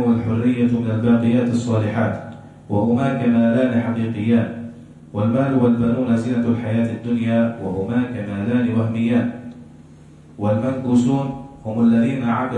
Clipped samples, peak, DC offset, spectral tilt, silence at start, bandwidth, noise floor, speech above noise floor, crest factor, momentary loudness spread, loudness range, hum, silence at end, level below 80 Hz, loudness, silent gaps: under 0.1%; -6 dBFS; under 0.1%; -8.5 dB/octave; 0 s; 9 kHz; -44 dBFS; 26 dB; 14 dB; 11 LU; 3 LU; none; 0 s; -52 dBFS; -19 LUFS; none